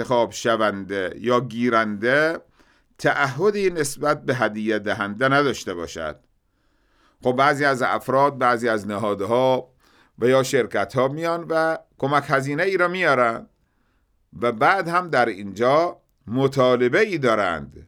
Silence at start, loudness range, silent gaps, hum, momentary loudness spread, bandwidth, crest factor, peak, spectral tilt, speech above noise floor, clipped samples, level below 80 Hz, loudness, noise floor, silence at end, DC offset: 0 s; 2 LU; none; none; 7 LU; 18 kHz; 18 dB; -4 dBFS; -5 dB/octave; 44 dB; under 0.1%; -58 dBFS; -21 LUFS; -65 dBFS; 0.05 s; under 0.1%